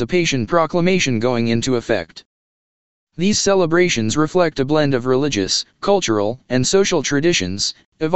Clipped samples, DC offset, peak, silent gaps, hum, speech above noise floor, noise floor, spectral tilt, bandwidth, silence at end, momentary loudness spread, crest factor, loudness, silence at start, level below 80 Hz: under 0.1%; 2%; 0 dBFS; 2.26-3.07 s, 7.86-7.92 s; none; over 73 dB; under -90 dBFS; -4 dB/octave; 8.4 kHz; 0 s; 6 LU; 18 dB; -17 LUFS; 0 s; -46 dBFS